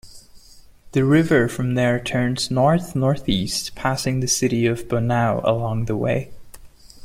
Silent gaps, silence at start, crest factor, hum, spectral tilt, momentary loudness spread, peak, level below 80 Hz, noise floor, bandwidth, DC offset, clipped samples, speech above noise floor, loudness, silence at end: none; 0.05 s; 16 dB; none; -5 dB/octave; 6 LU; -4 dBFS; -44 dBFS; -46 dBFS; 16 kHz; under 0.1%; under 0.1%; 27 dB; -20 LUFS; 0 s